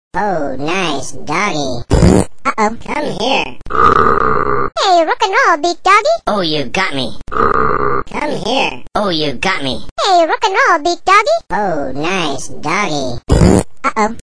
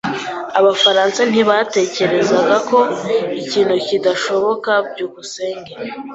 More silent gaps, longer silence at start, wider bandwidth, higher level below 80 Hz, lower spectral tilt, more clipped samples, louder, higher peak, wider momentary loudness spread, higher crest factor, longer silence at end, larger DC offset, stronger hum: first, 9.91-9.96 s vs none; about the same, 0.1 s vs 0.05 s; first, 11 kHz vs 8 kHz; first, -28 dBFS vs -60 dBFS; about the same, -4.5 dB/octave vs -3.5 dB/octave; first, 0.2% vs under 0.1%; about the same, -14 LUFS vs -15 LUFS; about the same, 0 dBFS vs 0 dBFS; second, 9 LU vs 13 LU; about the same, 14 dB vs 16 dB; first, 0.15 s vs 0 s; first, 7% vs under 0.1%; neither